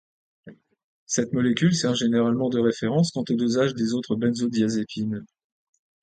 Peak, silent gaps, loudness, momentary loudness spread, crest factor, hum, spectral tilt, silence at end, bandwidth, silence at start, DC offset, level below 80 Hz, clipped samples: -8 dBFS; 0.84-1.07 s; -24 LUFS; 6 LU; 16 dB; none; -5.5 dB/octave; 0.8 s; 9.2 kHz; 0.45 s; under 0.1%; -64 dBFS; under 0.1%